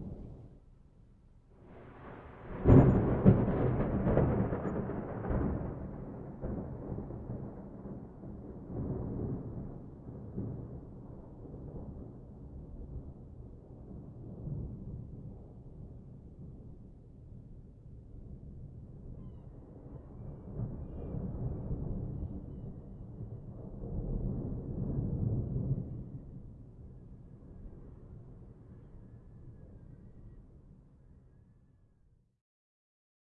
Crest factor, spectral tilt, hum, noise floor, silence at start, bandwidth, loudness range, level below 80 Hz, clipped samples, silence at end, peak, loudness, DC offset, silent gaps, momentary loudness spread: 28 dB; -11 dB/octave; none; -68 dBFS; 0 s; 3.5 kHz; 24 LU; -46 dBFS; under 0.1%; 2 s; -8 dBFS; -35 LUFS; under 0.1%; none; 22 LU